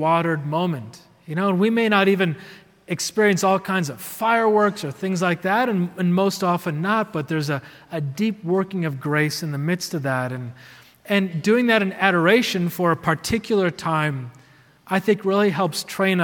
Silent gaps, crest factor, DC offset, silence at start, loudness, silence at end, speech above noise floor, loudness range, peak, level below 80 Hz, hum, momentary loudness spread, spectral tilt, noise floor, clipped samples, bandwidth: none; 18 dB; under 0.1%; 0 s; -21 LUFS; 0 s; 31 dB; 4 LU; -2 dBFS; -60 dBFS; none; 11 LU; -5.5 dB/octave; -52 dBFS; under 0.1%; 18 kHz